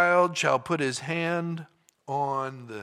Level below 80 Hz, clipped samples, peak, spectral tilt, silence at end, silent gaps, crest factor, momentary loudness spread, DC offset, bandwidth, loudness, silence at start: -74 dBFS; under 0.1%; -6 dBFS; -4.5 dB/octave; 0 s; none; 20 dB; 12 LU; under 0.1%; 14 kHz; -27 LUFS; 0 s